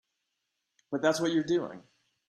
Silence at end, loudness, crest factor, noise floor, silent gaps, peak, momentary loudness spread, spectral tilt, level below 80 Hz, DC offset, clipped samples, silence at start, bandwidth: 0.5 s; -29 LUFS; 20 dB; -83 dBFS; none; -12 dBFS; 11 LU; -5 dB/octave; -72 dBFS; under 0.1%; under 0.1%; 0.9 s; 13 kHz